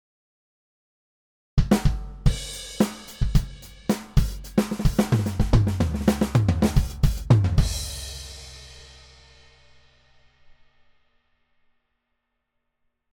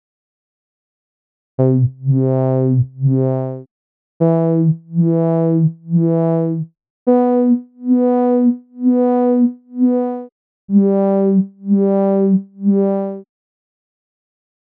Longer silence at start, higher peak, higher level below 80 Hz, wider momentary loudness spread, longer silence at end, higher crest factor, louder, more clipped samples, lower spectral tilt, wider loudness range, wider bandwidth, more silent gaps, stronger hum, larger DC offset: about the same, 1.55 s vs 1.6 s; about the same, -4 dBFS vs -2 dBFS; first, -30 dBFS vs -68 dBFS; first, 15 LU vs 8 LU; first, 4.3 s vs 1.4 s; first, 20 dB vs 14 dB; second, -24 LUFS vs -16 LUFS; neither; second, -6.5 dB/octave vs -14 dB/octave; first, 8 LU vs 2 LU; first, over 20 kHz vs 2.9 kHz; second, none vs 3.71-4.20 s, 6.90-7.06 s, 10.32-10.68 s; neither; neither